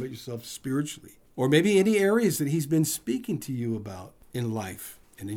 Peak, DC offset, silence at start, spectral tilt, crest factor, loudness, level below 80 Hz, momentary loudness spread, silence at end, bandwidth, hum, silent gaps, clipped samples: -8 dBFS; under 0.1%; 0 s; -5.5 dB/octave; 18 dB; -26 LUFS; -64 dBFS; 20 LU; 0 s; over 20 kHz; none; none; under 0.1%